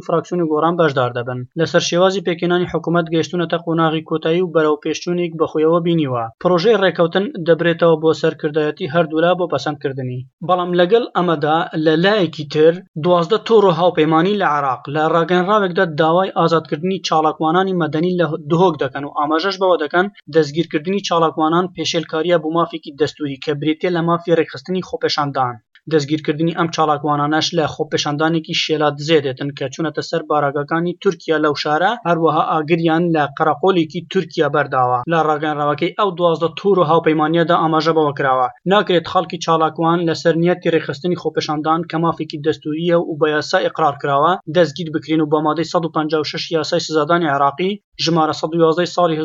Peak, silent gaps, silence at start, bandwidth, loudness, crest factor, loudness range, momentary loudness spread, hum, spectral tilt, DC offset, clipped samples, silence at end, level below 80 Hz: -2 dBFS; 10.33-10.38 s, 12.88-12.94 s, 47.84-47.92 s; 0.1 s; 7.6 kHz; -17 LUFS; 16 dB; 3 LU; 6 LU; none; -6 dB/octave; under 0.1%; under 0.1%; 0 s; -62 dBFS